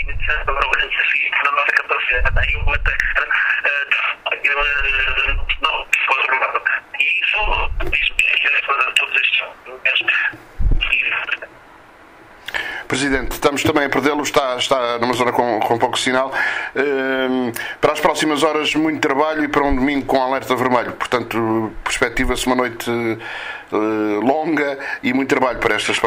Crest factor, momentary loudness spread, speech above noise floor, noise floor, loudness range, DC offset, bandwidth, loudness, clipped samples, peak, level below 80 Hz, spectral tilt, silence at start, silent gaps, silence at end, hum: 16 dB; 6 LU; 26 dB; -44 dBFS; 4 LU; under 0.1%; 16 kHz; -17 LUFS; under 0.1%; -2 dBFS; -30 dBFS; -3.5 dB/octave; 0 s; none; 0 s; none